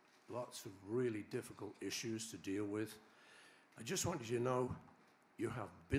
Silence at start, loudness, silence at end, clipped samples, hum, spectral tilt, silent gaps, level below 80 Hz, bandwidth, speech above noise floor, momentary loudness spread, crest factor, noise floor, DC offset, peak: 0.3 s; -44 LUFS; 0 s; under 0.1%; none; -4.5 dB/octave; none; -74 dBFS; 15.5 kHz; 22 dB; 21 LU; 22 dB; -65 dBFS; under 0.1%; -22 dBFS